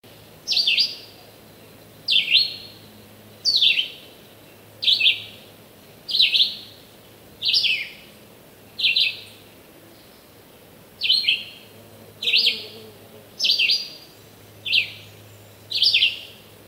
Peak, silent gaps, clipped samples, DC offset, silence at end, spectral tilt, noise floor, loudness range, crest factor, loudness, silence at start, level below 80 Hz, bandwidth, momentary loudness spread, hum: -4 dBFS; none; under 0.1%; under 0.1%; 0.35 s; 0 dB/octave; -48 dBFS; 3 LU; 22 dB; -19 LUFS; 0.45 s; -66 dBFS; 16 kHz; 21 LU; none